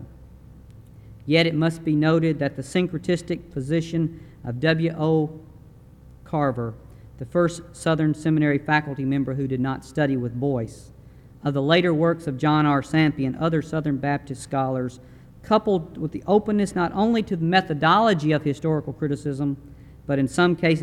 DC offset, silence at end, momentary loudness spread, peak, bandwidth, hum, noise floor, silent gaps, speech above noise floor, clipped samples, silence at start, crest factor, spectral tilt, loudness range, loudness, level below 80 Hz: under 0.1%; 0 s; 10 LU; -4 dBFS; 12 kHz; none; -47 dBFS; none; 25 dB; under 0.1%; 0 s; 18 dB; -7 dB/octave; 4 LU; -23 LUFS; -50 dBFS